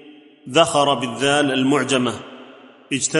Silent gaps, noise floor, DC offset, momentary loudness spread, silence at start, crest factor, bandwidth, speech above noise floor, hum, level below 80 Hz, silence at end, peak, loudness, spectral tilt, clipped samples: none; -44 dBFS; under 0.1%; 10 LU; 0.05 s; 18 dB; 11.5 kHz; 26 dB; none; -60 dBFS; 0 s; -2 dBFS; -18 LUFS; -3.5 dB/octave; under 0.1%